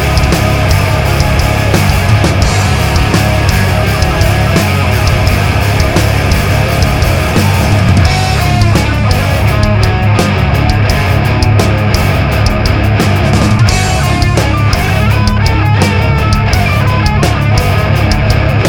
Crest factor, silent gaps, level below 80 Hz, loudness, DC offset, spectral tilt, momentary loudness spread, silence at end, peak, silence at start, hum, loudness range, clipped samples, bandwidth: 8 dB; none; -16 dBFS; -10 LUFS; under 0.1%; -5.5 dB/octave; 1 LU; 0 s; 0 dBFS; 0 s; none; 0 LU; under 0.1%; 18.5 kHz